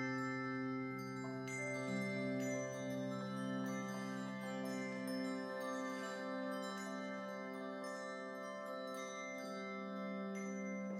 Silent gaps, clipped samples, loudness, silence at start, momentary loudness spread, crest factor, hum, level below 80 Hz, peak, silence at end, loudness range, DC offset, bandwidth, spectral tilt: none; under 0.1%; -44 LUFS; 0 s; 5 LU; 14 dB; none; -88 dBFS; -30 dBFS; 0 s; 3 LU; under 0.1%; 16 kHz; -5.5 dB/octave